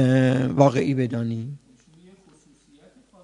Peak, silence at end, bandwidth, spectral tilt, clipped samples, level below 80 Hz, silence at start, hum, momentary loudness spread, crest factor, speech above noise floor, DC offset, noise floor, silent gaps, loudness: -2 dBFS; 1.65 s; 10.5 kHz; -8 dB/octave; under 0.1%; -62 dBFS; 0 s; none; 16 LU; 22 dB; 36 dB; under 0.1%; -56 dBFS; none; -21 LUFS